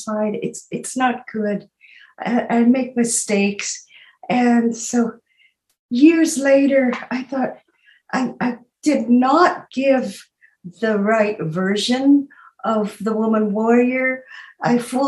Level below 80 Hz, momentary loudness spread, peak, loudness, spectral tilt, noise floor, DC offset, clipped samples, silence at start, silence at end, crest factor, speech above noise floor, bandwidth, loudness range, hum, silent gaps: -68 dBFS; 12 LU; 0 dBFS; -19 LUFS; -4.5 dB/octave; -60 dBFS; under 0.1%; under 0.1%; 0 s; 0 s; 18 dB; 42 dB; 12.5 kHz; 2 LU; none; 5.79-5.89 s